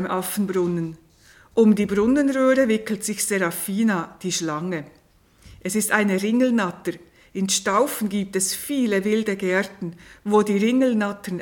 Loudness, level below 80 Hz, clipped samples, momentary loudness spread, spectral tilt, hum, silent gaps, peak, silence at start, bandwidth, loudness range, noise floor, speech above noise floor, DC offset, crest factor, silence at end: -22 LUFS; -58 dBFS; under 0.1%; 12 LU; -4.5 dB/octave; none; none; -4 dBFS; 0 s; 18 kHz; 3 LU; -55 dBFS; 34 dB; under 0.1%; 18 dB; 0 s